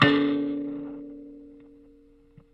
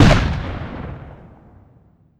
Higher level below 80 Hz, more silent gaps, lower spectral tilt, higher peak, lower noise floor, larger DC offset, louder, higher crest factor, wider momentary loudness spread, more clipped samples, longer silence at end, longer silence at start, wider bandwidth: second, -62 dBFS vs -26 dBFS; neither; about the same, -7 dB/octave vs -6.5 dB/octave; second, -4 dBFS vs 0 dBFS; first, -56 dBFS vs -52 dBFS; neither; second, -27 LUFS vs -21 LUFS; first, 24 dB vs 18 dB; about the same, 24 LU vs 24 LU; neither; about the same, 1 s vs 1.1 s; about the same, 0 s vs 0 s; second, 5.8 kHz vs 11.5 kHz